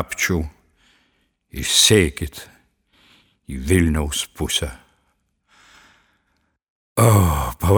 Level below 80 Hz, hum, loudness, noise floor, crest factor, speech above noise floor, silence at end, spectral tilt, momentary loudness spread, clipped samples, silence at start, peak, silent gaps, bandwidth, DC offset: -34 dBFS; none; -18 LUFS; -68 dBFS; 20 dB; 50 dB; 0 s; -4 dB/octave; 18 LU; under 0.1%; 0 s; 0 dBFS; 6.68-6.96 s; over 20 kHz; under 0.1%